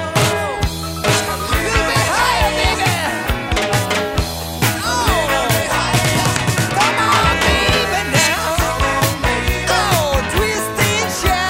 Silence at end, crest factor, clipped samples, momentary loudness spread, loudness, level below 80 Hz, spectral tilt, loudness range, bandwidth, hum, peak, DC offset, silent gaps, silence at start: 0 s; 16 dB; under 0.1%; 5 LU; -16 LUFS; -28 dBFS; -3.5 dB/octave; 2 LU; 16.5 kHz; none; 0 dBFS; under 0.1%; none; 0 s